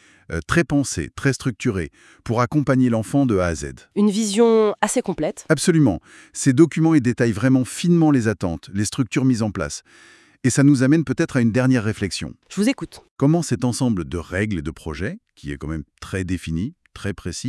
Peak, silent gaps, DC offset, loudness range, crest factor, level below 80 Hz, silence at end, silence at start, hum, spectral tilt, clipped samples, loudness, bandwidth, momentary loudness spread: -2 dBFS; 13.11-13.16 s; under 0.1%; 6 LU; 18 dB; -46 dBFS; 0 s; 0.3 s; none; -6 dB/octave; under 0.1%; -20 LUFS; 12 kHz; 14 LU